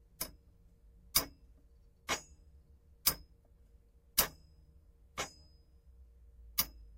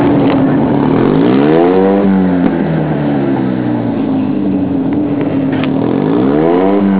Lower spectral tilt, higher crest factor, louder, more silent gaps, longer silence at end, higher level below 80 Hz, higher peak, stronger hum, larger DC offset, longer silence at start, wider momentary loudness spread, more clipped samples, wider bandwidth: second, -0.5 dB/octave vs -12.5 dB/octave; first, 30 dB vs 10 dB; second, -36 LUFS vs -12 LUFS; neither; first, 0.15 s vs 0 s; second, -58 dBFS vs -38 dBFS; second, -12 dBFS vs 0 dBFS; neither; neither; first, 0.2 s vs 0 s; first, 15 LU vs 5 LU; neither; first, 16 kHz vs 4 kHz